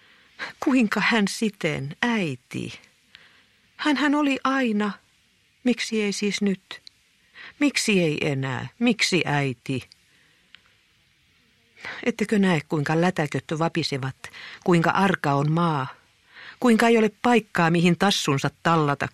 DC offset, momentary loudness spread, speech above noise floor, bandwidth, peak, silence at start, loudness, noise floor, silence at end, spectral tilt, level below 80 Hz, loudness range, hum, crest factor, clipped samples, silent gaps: under 0.1%; 15 LU; 40 dB; 14 kHz; -4 dBFS; 0.4 s; -23 LUFS; -63 dBFS; 0.05 s; -5 dB/octave; -62 dBFS; 6 LU; none; 20 dB; under 0.1%; none